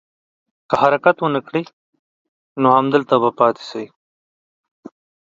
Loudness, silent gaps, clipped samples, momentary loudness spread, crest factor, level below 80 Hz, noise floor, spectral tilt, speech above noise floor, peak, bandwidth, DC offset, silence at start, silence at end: -17 LUFS; 1.73-1.93 s, 1.99-2.56 s; under 0.1%; 17 LU; 20 dB; -64 dBFS; under -90 dBFS; -7 dB/octave; over 74 dB; 0 dBFS; 7.6 kHz; under 0.1%; 0.7 s; 1.4 s